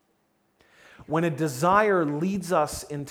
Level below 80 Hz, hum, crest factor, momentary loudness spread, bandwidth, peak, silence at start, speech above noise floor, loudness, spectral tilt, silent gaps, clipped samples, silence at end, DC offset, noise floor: -56 dBFS; none; 20 dB; 9 LU; 18 kHz; -6 dBFS; 1 s; 45 dB; -25 LUFS; -5.5 dB/octave; none; under 0.1%; 0 s; under 0.1%; -69 dBFS